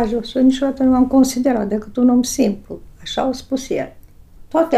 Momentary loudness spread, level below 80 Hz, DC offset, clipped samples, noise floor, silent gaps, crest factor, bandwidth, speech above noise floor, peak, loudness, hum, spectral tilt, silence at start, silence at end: 11 LU; -42 dBFS; under 0.1%; under 0.1%; -41 dBFS; none; 14 dB; 14.5 kHz; 24 dB; -4 dBFS; -17 LUFS; none; -5 dB/octave; 0 s; 0 s